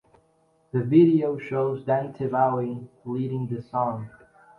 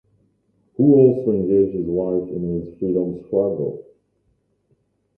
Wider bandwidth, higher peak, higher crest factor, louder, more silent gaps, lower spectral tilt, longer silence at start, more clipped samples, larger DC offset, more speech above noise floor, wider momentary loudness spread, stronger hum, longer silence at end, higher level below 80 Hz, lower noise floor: first, 4.4 kHz vs 2.7 kHz; second, -6 dBFS vs -2 dBFS; about the same, 18 dB vs 18 dB; second, -24 LUFS vs -19 LUFS; neither; second, -10.5 dB/octave vs -14 dB/octave; about the same, 0.75 s vs 0.8 s; neither; neither; second, 41 dB vs 48 dB; about the same, 15 LU vs 13 LU; neither; second, 0.5 s vs 1.35 s; second, -66 dBFS vs -52 dBFS; about the same, -64 dBFS vs -66 dBFS